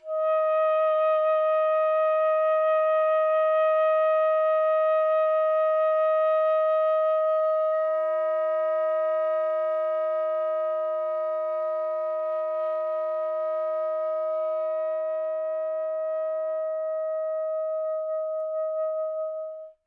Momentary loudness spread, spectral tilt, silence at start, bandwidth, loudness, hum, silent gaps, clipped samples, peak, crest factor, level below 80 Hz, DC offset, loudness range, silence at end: 7 LU; -2 dB/octave; 0.05 s; 4 kHz; -25 LUFS; none; none; under 0.1%; -16 dBFS; 8 dB; -88 dBFS; under 0.1%; 6 LU; 0.15 s